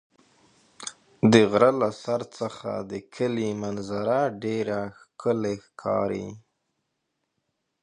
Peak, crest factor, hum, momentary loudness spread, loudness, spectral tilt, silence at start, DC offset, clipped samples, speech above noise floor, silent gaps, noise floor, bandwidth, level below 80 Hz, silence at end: -2 dBFS; 24 dB; none; 18 LU; -25 LUFS; -6 dB/octave; 0.8 s; under 0.1%; under 0.1%; 54 dB; none; -79 dBFS; 10.5 kHz; -62 dBFS; 1.45 s